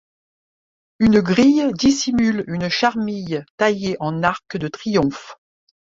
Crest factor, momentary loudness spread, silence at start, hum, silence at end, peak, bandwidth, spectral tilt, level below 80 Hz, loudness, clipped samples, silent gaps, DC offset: 18 dB; 11 LU; 1 s; none; 0.6 s; -2 dBFS; 7.8 kHz; -5 dB/octave; -48 dBFS; -19 LUFS; under 0.1%; 3.50-3.58 s; under 0.1%